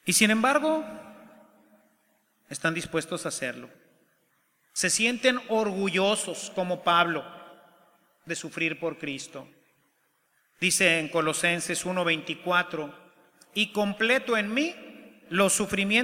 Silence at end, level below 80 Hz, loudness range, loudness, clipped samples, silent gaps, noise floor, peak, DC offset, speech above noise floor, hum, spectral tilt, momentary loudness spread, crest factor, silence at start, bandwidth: 0 s; -66 dBFS; 9 LU; -26 LUFS; under 0.1%; none; -70 dBFS; -6 dBFS; under 0.1%; 44 dB; none; -3 dB/octave; 14 LU; 24 dB; 0.05 s; 16.5 kHz